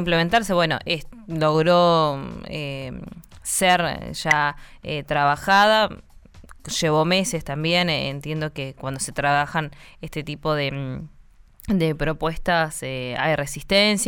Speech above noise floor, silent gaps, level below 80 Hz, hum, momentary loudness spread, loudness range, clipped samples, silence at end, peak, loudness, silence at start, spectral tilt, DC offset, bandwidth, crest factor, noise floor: 27 dB; none; -44 dBFS; none; 15 LU; 5 LU; under 0.1%; 0 s; -6 dBFS; -22 LUFS; 0 s; -4 dB/octave; under 0.1%; over 20 kHz; 16 dB; -49 dBFS